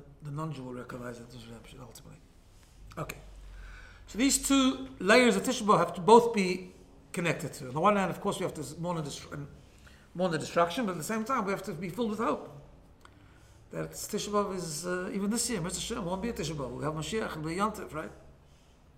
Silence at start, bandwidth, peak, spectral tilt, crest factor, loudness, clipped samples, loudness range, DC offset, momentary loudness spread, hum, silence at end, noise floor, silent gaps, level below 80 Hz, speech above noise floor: 0 s; 16.5 kHz; -6 dBFS; -4 dB/octave; 24 dB; -30 LUFS; under 0.1%; 10 LU; under 0.1%; 22 LU; none; 0.65 s; -58 dBFS; none; -54 dBFS; 28 dB